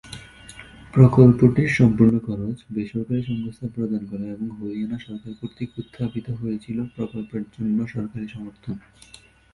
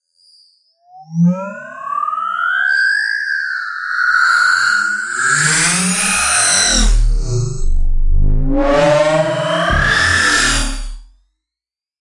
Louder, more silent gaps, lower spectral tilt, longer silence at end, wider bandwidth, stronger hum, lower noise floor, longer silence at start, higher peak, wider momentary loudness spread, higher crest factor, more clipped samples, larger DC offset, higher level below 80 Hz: second, -22 LUFS vs -14 LUFS; neither; first, -9 dB/octave vs -2.5 dB/octave; second, 0.75 s vs 0.95 s; about the same, 11.5 kHz vs 11.5 kHz; neither; second, -44 dBFS vs -88 dBFS; second, 0.05 s vs 0.95 s; about the same, 0 dBFS vs 0 dBFS; first, 20 LU vs 11 LU; first, 22 dB vs 14 dB; neither; neither; second, -48 dBFS vs -20 dBFS